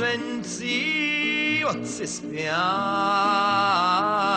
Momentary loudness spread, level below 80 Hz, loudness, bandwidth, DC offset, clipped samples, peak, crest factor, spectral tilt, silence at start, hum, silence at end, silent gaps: 9 LU; -64 dBFS; -23 LUFS; 10 kHz; under 0.1%; under 0.1%; -10 dBFS; 14 dB; -3 dB/octave; 0 s; none; 0 s; none